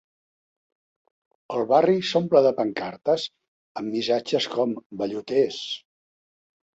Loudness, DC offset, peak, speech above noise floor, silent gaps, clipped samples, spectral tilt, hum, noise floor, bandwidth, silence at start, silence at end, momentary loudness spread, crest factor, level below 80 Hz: -24 LUFS; under 0.1%; -4 dBFS; over 67 dB; 3.48-3.75 s, 4.86-4.90 s; under 0.1%; -5.5 dB/octave; none; under -90 dBFS; 8 kHz; 1.5 s; 1 s; 13 LU; 20 dB; -70 dBFS